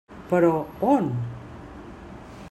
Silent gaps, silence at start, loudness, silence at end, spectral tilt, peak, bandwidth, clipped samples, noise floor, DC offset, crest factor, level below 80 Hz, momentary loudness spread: none; 0.1 s; -23 LUFS; 0 s; -9 dB/octave; -6 dBFS; 12.5 kHz; under 0.1%; -41 dBFS; under 0.1%; 18 dB; -52 dBFS; 21 LU